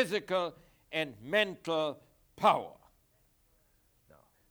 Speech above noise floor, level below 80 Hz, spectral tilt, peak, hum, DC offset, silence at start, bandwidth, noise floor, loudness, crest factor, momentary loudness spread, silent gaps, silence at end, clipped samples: 38 dB; -72 dBFS; -4.5 dB/octave; -12 dBFS; none; under 0.1%; 0 s; over 20 kHz; -70 dBFS; -32 LUFS; 22 dB; 11 LU; none; 1.8 s; under 0.1%